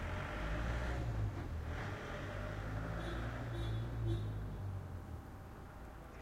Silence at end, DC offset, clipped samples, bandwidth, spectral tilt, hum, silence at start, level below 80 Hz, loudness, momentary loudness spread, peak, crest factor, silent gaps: 0 s; under 0.1%; under 0.1%; 15.5 kHz; -7 dB/octave; none; 0 s; -46 dBFS; -43 LUFS; 12 LU; -28 dBFS; 14 dB; none